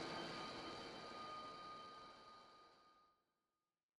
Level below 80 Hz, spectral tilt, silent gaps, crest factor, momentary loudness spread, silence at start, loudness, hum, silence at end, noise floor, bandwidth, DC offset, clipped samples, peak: -80 dBFS; -3.5 dB/octave; none; 18 dB; 16 LU; 0 s; -53 LUFS; none; 0.9 s; under -90 dBFS; 12 kHz; under 0.1%; under 0.1%; -36 dBFS